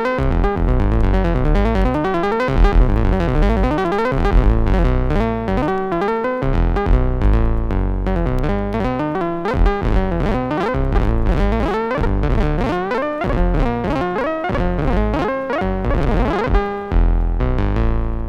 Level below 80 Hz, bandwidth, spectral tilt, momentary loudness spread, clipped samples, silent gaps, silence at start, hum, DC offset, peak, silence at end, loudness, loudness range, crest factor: -18 dBFS; 6.4 kHz; -8.5 dB/octave; 3 LU; under 0.1%; none; 0 s; none; under 0.1%; -2 dBFS; 0 s; -19 LUFS; 2 LU; 14 dB